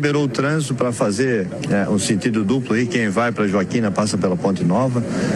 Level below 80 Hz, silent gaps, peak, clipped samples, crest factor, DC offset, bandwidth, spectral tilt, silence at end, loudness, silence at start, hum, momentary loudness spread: -54 dBFS; none; -6 dBFS; under 0.1%; 12 dB; under 0.1%; 12.5 kHz; -5.5 dB/octave; 0 s; -19 LUFS; 0 s; none; 2 LU